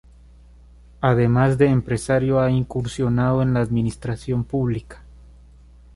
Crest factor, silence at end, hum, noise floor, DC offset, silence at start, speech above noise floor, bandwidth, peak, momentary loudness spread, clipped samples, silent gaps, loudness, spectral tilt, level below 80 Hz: 18 dB; 0.95 s; 60 Hz at -35 dBFS; -47 dBFS; under 0.1%; 1 s; 28 dB; 11.5 kHz; -4 dBFS; 8 LU; under 0.1%; none; -21 LUFS; -8 dB/octave; -42 dBFS